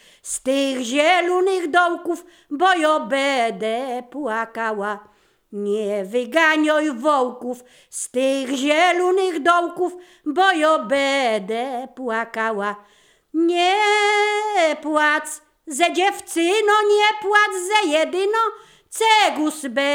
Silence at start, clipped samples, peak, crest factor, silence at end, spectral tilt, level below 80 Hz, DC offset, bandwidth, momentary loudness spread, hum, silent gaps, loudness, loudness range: 0.25 s; under 0.1%; -2 dBFS; 18 dB; 0 s; -2 dB/octave; -70 dBFS; under 0.1%; 19 kHz; 12 LU; none; none; -19 LUFS; 4 LU